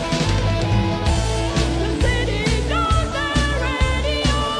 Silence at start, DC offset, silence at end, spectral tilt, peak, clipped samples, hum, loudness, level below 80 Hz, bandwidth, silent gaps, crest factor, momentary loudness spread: 0 s; under 0.1%; 0 s; -5 dB/octave; -6 dBFS; under 0.1%; none; -20 LUFS; -24 dBFS; 11 kHz; none; 14 dB; 1 LU